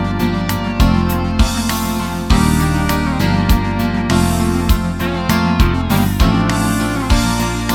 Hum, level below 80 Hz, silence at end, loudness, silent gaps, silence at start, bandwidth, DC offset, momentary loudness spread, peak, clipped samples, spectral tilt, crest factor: none; -20 dBFS; 0 s; -16 LUFS; none; 0 s; 18.5 kHz; under 0.1%; 4 LU; 0 dBFS; under 0.1%; -5.5 dB/octave; 14 dB